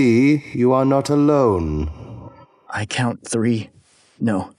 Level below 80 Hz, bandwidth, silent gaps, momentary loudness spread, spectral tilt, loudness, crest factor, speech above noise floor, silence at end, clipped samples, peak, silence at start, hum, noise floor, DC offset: -38 dBFS; 11.5 kHz; none; 17 LU; -6.5 dB/octave; -19 LUFS; 14 dB; 25 dB; 0.1 s; under 0.1%; -4 dBFS; 0 s; none; -42 dBFS; under 0.1%